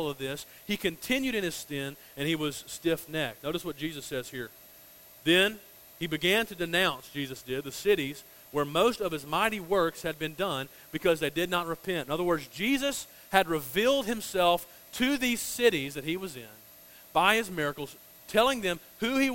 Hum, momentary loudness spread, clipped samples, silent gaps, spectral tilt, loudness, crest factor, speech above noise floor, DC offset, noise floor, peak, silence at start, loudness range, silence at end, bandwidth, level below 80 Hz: none; 11 LU; under 0.1%; none; -3.5 dB/octave; -29 LUFS; 26 dB; 24 dB; under 0.1%; -53 dBFS; -4 dBFS; 0 s; 4 LU; 0 s; 16.5 kHz; -58 dBFS